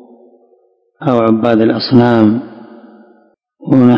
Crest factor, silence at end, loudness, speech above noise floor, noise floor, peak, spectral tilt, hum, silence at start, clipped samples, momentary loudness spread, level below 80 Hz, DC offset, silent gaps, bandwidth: 12 dB; 0 s; -11 LUFS; 44 dB; -54 dBFS; 0 dBFS; -9 dB/octave; none; 1 s; 0.9%; 11 LU; -50 dBFS; under 0.1%; none; 5.4 kHz